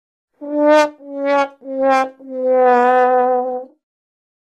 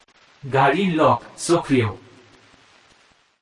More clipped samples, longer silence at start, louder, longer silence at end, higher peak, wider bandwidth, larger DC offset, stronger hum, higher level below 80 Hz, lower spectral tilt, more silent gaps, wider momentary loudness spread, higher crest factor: neither; about the same, 0.4 s vs 0.45 s; first, -16 LUFS vs -20 LUFS; second, 0.9 s vs 1.45 s; first, -2 dBFS vs -6 dBFS; second, 10 kHz vs 11.5 kHz; neither; neither; second, -70 dBFS vs -56 dBFS; second, -3 dB/octave vs -5.5 dB/octave; neither; about the same, 12 LU vs 12 LU; about the same, 16 dB vs 16 dB